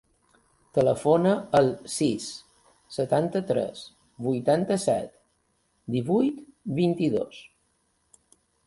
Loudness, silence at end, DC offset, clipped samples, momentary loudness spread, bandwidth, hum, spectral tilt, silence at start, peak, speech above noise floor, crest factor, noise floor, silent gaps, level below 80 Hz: -26 LUFS; 1.25 s; under 0.1%; under 0.1%; 16 LU; 11.5 kHz; none; -6 dB/octave; 0.75 s; -8 dBFS; 46 dB; 20 dB; -71 dBFS; none; -62 dBFS